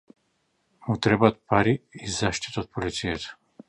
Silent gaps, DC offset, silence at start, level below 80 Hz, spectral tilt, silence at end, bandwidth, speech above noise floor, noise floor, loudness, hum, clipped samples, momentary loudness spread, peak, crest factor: none; under 0.1%; 0.85 s; -50 dBFS; -5 dB/octave; 0.35 s; 11 kHz; 47 dB; -72 dBFS; -25 LUFS; none; under 0.1%; 12 LU; -2 dBFS; 24 dB